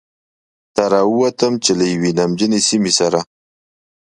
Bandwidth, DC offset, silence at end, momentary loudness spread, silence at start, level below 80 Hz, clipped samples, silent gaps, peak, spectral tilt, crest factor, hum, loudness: 11.5 kHz; under 0.1%; 0.9 s; 6 LU; 0.75 s; -56 dBFS; under 0.1%; none; 0 dBFS; -4 dB/octave; 16 dB; none; -15 LUFS